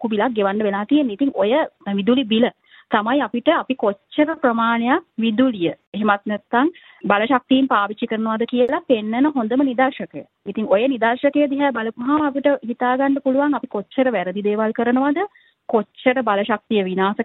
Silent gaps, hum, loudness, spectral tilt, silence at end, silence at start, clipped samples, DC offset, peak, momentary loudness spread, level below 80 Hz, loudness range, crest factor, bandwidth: 5.87-5.93 s; none; -19 LUFS; -9 dB/octave; 0 s; 0 s; under 0.1%; under 0.1%; -2 dBFS; 6 LU; -66 dBFS; 1 LU; 18 dB; 4.1 kHz